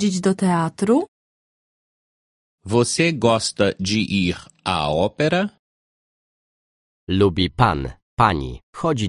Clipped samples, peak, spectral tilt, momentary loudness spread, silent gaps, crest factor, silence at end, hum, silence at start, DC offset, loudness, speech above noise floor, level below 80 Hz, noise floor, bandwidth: under 0.1%; 0 dBFS; -5 dB/octave; 9 LU; 1.08-2.58 s, 5.59-7.07 s, 8.02-8.17 s, 8.63-8.73 s; 20 dB; 0 s; none; 0 s; under 0.1%; -20 LUFS; over 71 dB; -42 dBFS; under -90 dBFS; 11.5 kHz